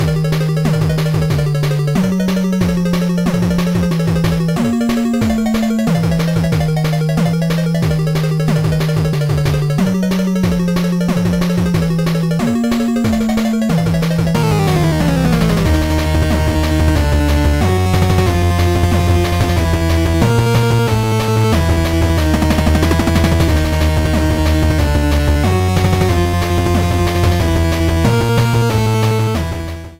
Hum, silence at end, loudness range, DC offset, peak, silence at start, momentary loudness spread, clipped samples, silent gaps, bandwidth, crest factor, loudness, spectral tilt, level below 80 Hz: none; 0.05 s; 2 LU; 0.3%; 0 dBFS; 0 s; 2 LU; under 0.1%; none; 16.5 kHz; 12 dB; -14 LUFS; -6.5 dB/octave; -22 dBFS